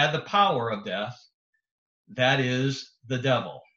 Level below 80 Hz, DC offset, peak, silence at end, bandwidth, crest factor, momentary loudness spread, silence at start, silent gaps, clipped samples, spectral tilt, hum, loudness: -68 dBFS; under 0.1%; -8 dBFS; 0.15 s; 7.6 kHz; 20 dB; 12 LU; 0 s; 1.34-1.53 s, 1.71-2.05 s; under 0.1%; -5 dB/octave; none; -26 LUFS